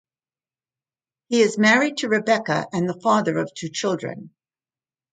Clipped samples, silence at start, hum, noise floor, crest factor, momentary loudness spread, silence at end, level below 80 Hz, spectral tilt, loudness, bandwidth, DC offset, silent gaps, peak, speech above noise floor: under 0.1%; 1.3 s; none; under -90 dBFS; 20 dB; 11 LU; 0.85 s; -70 dBFS; -4.5 dB/octave; -21 LUFS; 9.4 kHz; under 0.1%; none; -4 dBFS; over 69 dB